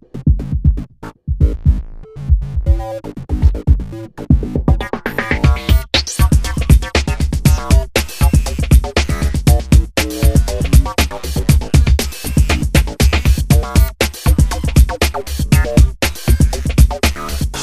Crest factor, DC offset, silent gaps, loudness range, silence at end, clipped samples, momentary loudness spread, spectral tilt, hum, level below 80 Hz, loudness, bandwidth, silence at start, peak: 14 dB; 2%; none; 4 LU; 0 s; under 0.1%; 6 LU; -5.5 dB/octave; none; -16 dBFS; -15 LUFS; 15.5 kHz; 0.15 s; 0 dBFS